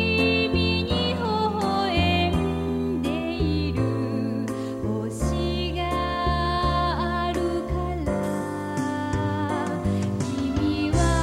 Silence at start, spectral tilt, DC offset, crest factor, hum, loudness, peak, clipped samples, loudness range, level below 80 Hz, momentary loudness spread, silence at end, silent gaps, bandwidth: 0 s; -6 dB/octave; under 0.1%; 16 dB; none; -25 LUFS; -8 dBFS; under 0.1%; 3 LU; -34 dBFS; 6 LU; 0 s; none; 14 kHz